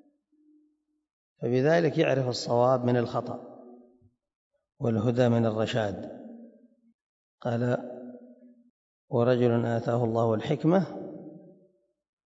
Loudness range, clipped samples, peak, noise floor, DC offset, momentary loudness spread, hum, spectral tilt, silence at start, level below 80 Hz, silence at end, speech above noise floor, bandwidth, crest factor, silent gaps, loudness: 5 LU; under 0.1%; -10 dBFS; -72 dBFS; under 0.1%; 19 LU; none; -7.5 dB/octave; 1.4 s; -68 dBFS; 0.9 s; 47 dB; 7.8 kHz; 18 dB; 4.36-4.51 s, 6.94-7.38 s, 8.70-9.08 s; -27 LUFS